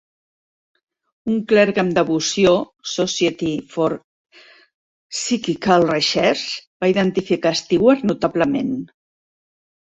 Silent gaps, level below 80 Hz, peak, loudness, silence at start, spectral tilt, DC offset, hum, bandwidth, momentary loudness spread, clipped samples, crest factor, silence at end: 4.04-4.25 s, 4.74-5.10 s, 6.67-6.80 s; -56 dBFS; -2 dBFS; -19 LUFS; 1.25 s; -4.5 dB/octave; under 0.1%; none; 8.2 kHz; 10 LU; under 0.1%; 18 dB; 0.95 s